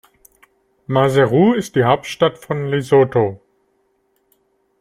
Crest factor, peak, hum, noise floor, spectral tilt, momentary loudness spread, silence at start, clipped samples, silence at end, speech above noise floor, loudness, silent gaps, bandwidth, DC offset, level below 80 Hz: 18 dB; 0 dBFS; none; -64 dBFS; -6.5 dB/octave; 7 LU; 0.9 s; under 0.1%; 1.45 s; 49 dB; -16 LUFS; none; 15 kHz; under 0.1%; -56 dBFS